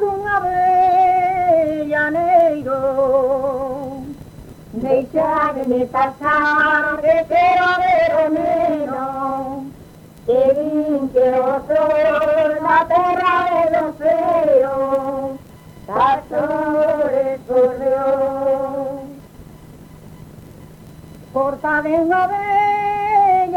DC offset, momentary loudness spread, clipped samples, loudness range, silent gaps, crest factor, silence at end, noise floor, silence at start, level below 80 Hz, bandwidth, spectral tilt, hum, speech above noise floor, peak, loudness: under 0.1%; 11 LU; under 0.1%; 5 LU; none; 14 dB; 0 s; -41 dBFS; 0 s; -48 dBFS; 16.5 kHz; -6.5 dB/octave; none; 24 dB; -4 dBFS; -17 LUFS